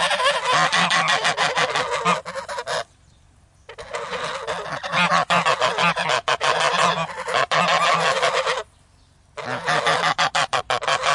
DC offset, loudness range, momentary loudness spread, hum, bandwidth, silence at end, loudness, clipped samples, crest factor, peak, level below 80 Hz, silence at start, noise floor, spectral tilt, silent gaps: under 0.1%; 6 LU; 11 LU; none; 11.5 kHz; 0 s; -20 LUFS; under 0.1%; 18 dB; -4 dBFS; -58 dBFS; 0 s; -55 dBFS; -2 dB/octave; none